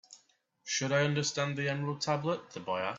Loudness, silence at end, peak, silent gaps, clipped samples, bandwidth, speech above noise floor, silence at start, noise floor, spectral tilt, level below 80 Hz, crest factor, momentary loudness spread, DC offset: -32 LUFS; 0 s; -14 dBFS; none; under 0.1%; 7.8 kHz; 37 dB; 0.1 s; -70 dBFS; -4 dB/octave; -74 dBFS; 18 dB; 8 LU; under 0.1%